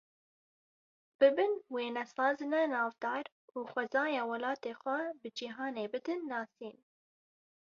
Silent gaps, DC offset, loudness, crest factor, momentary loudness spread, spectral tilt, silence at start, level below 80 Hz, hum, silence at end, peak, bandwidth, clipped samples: 3.32-3.48 s; under 0.1%; -35 LUFS; 20 dB; 13 LU; -1 dB/octave; 1.2 s; -86 dBFS; none; 1.05 s; -16 dBFS; 7.2 kHz; under 0.1%